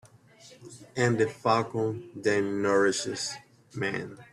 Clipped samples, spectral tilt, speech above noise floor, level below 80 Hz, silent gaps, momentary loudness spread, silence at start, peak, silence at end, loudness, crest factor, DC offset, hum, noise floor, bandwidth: under 0.1%; -4.5 dB/octave; 27 dB; -68 dBFS; none; 17 LU; 0.05 s; -10 dBFS; 0.1 s; -28 LUFS; 18 dB; under 0.1%; none; -54 dBFS; 12.5 kHz